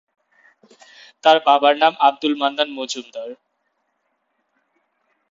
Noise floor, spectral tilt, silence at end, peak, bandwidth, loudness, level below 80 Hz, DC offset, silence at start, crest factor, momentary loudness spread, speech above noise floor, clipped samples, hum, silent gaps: -71 dBFS; -2.5 dB/octave; 1.95 s; 0 dBFS; 7.8 kHz; -17 LUFS; -72 dBFS; under 0.1%; 1.25 s; 20 dB; 18 LU; 53 dB; under 0.1%; none; none